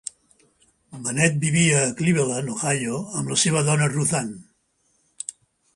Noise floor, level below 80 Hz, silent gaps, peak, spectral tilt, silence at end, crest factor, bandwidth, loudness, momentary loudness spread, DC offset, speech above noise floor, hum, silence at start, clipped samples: -67 dBFS; -60 dBFS; none; -4 dBFS; -4 dB/octave; 0.45 s; 20 dB; 11.5 kHz; -21 LUFS; 16 LU; under 0.1%; 46 dB; none; 0.9 s; under 0.1%